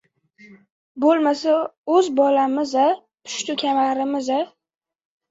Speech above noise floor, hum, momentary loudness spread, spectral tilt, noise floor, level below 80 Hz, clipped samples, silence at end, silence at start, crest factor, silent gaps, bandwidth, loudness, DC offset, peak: 32 dB; none; 9 LU; -3 dB/octave; -51 dBFS; -70 dBFS; under 0.1%; 0.85 s; 0.5 s; 16 dB; 0.70-0.95 s, 1.77-1.84 s; 8 kHz; -20 LUFS; under 0.1%; -6 dBFS